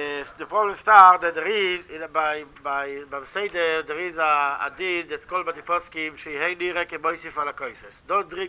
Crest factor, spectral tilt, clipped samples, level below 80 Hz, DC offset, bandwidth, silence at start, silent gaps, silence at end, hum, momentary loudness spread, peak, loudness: 22 dB; -6.5 dB/octave; under 0.1%; -60 dBFS; under 0.1%; 4 kHz; 0 s; none; 0 s; none; 15 LU; 0 dBFS; -22 LUFS